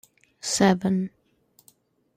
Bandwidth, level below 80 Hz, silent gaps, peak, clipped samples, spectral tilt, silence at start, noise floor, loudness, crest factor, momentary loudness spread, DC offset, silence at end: 14.5 kHz; -62 dBFS; none; -6 dBFS; under 0.1%; -4.5 dB/octave; 0.45 s; -63 dBFS; -24 LUFS; 20 dB; 14 LU; under 0.1%; 1.1 s